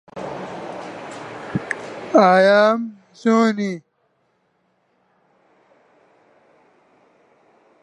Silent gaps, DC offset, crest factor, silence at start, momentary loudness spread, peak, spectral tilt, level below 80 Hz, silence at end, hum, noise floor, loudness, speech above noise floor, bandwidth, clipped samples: none; under 0.1%; 20 dB; 0.15 s; 21 LU; -2 dBFS; -6 dB/octave; -64 dBFS; 4.05 s; none; -66 dBFS; -18 LUFS; 51 dB; 10.5 kHz; under 0.1%